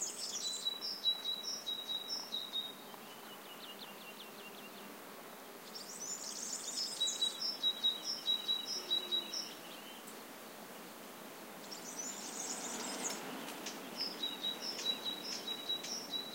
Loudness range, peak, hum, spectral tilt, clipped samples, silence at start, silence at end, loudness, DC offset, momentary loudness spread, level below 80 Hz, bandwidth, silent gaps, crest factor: 11 LU; -24 dBFS; none; 0 dB/octave; under 0.1%; 0 s; 0 s; -38 LUFS; under 0.1%; 16 LU; under -90 dBFS; 16 kHz; none; 18 dB